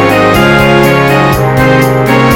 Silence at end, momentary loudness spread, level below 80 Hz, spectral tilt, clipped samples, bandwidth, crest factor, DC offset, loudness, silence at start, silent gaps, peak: 0 s; 2 LU; -26 dBFS; -6 dB/octave; 5%; 17.5 kHz; 6 dB; under 0.1%; -7 LUFS; 0 s; none; 0 dBFS